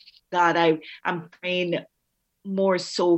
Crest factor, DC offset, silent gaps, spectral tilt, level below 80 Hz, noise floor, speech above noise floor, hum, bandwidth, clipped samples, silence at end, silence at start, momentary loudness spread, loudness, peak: 18 dB; under 0.1%; none; -5 dB/octave; -80 dBFS; -76 dBFS; 53 dB; none; 8.6 kHz; under 0.1%; 0 s; 0.3 s; 11 LU; -24 LUFS; -8 dBFS